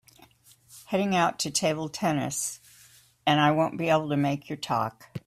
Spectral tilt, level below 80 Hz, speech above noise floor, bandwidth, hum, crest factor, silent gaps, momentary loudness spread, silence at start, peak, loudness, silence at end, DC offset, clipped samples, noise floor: -4.5 dB/octave; -66 dBFS; 31 dB; 15.5 kHz; none; 18 dB; none; 9 LU; 0.7 s; -10 dBFS; -26 LUFS; 0.05 s; under 0.1%; under 0.1%; -57 dBFS